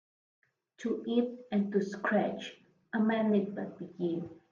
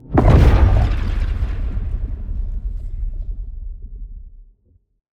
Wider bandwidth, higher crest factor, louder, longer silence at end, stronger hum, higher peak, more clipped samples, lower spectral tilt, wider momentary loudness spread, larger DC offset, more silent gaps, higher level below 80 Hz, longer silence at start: about the same, 7.2 kHz vs 6.8 kHz; about the same, 16 dB vs 18 dB; second, -33 LUFS vs -19 LUFS; second, 0.15 s vs 0.7 s; neither; second, -16 dBFS vs 0 dBFS; neither; second, -7 dB/octave vs -8.5 dB/octave; second, 12 LU vs 23 LU; neither; neither; second, -78 dBFS vs -20 dBFS; first, 0.8 s vs 0.05 s